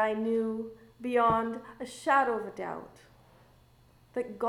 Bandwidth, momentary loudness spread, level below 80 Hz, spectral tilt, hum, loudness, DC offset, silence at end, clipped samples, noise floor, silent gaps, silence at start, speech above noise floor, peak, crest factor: 13 kHz; 15 LU; -62 dBFS; -5.5 dB/octave; none; -30 LUFS; under 0.1%; 0 s; under 0.1%; -61 dBFS; none; 0 s; 31 dB; -12 dBFS; 18 dB